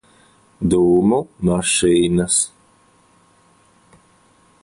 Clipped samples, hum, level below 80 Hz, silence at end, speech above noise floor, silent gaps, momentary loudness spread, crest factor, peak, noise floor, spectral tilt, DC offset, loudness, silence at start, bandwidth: under 0.1%; none; -44 dBFS; 2.15 s; 39 dB; none; 6 LU; 16 dB; -4 dBFS; -55 dBFS; -4.5 dB/octave; under 0.1%; -17 LUFS; 0.6 s; 11.5 kHz